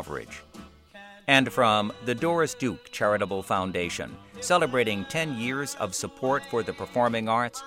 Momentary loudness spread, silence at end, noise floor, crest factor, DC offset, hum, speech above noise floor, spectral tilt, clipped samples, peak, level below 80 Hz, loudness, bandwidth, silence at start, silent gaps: 13 LU; 0 s; -49 dBFS; 22 dB; under 0.1%; none; 22 dB; -4 dB/octave; under 0.1%; -4 dBFS; -60 dBFS; -26 LUFS; 16.5 kHz; 0 s; none